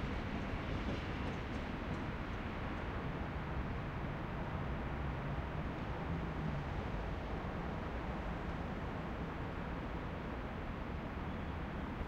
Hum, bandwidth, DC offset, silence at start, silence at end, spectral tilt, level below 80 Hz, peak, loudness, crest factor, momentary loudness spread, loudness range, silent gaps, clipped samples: none; 8.8 kHz; under 0.1%; 0 s; 0 s; -7.5 dB/octave; -46 dBFS; -28 dBFS; -42 LUFS; 14 dB; 2 LU; 1 LU; none; under 0.1%